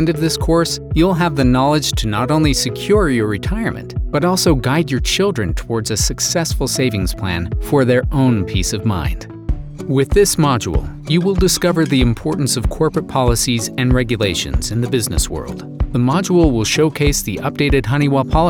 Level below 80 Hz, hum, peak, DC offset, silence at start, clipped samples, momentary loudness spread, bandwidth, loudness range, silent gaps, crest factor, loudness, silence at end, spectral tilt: -26 dBFS; none; 0 dBFS; under 0.1%; 0 s; under 0.1%; 8 LU; over 20 kHz; 2 LU; none; 14 dB; -16 LUFS; 0 s; -5 dB/octave